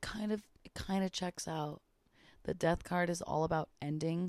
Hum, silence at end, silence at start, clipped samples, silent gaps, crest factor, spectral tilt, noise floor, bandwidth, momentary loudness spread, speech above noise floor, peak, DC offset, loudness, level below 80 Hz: none; 0 s; 0 s; under 0.1%; none; 18 dB; -5.5 dB/octave; -66 dBFS; 14 kHz; 11 LU; 30 dB; -20 dBFS; under 0.1%; -37 LUFS; -58 dBFS